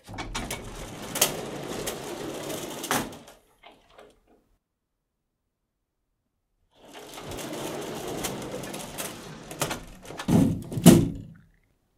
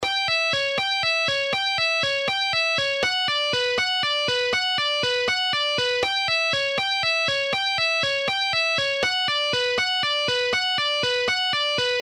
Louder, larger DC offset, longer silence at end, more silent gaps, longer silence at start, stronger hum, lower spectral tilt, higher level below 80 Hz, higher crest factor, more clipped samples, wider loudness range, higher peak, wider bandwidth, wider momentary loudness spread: second, -27 LUFS vs -21 LUFS; neither; first, 0.6 s vs 0 s; neither; about the same, 0.05 s vs 0 s; neither; first, -5 dB/octave vs -1.5 dB/octave; first, -50 dBFS vs -58 dBFS; first, 30 dB vs 14 dB; neither; first, 16 LU vs 0 LU; first, 0 dBFS vs -10 dBFS; first, 16.5 kHz vs 14.5 kHz; first, 20 LU vs 1 LU